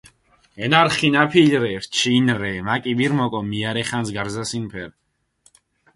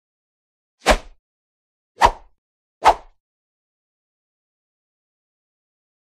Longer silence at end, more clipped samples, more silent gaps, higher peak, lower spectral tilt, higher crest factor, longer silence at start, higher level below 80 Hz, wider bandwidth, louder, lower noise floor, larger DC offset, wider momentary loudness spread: second, 1.05 s vs 3.1 s; neither; second, none vs 1.19-1.95 s, 2.38-2.81 s; about the same, 0 dBFS vs 0 dBFS; first, -4.5 dB/octave vs -3 dB/octave; second, 20 dB vs 26 dB; second, 0.55 s vs 0.85 s; second, -54 dBFS vs -36 dBFS; second, 11.5 kHz vs 15.5 kHz; about the same, -19 LUFS vs -19 LUFS; second, -60 dBFS vs under -90 dBFS; neither; first, 12 LU vs 5 LU